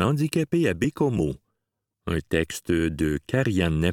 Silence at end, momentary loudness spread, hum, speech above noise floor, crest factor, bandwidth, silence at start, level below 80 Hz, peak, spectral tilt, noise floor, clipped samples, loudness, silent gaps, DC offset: 0 s; 7 LU; none; 58 dB; 18 dB; 17.5 kHz; 0 s; -42 dBFS; -6 dBFS; -6.5 dB/octave; -82 dBFS; under 0.1%; -25 LUFS; none; under 0.1%